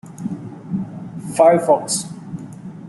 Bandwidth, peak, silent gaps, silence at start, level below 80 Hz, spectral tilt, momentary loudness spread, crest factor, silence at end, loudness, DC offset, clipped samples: 12 kHz; -2 dBFS; none; 0.05 s; -60 dBFS; -5 dB/octave; 19 LU; 18 dB; 0 s; -18 LUFS; under 0.1%; under 0.1%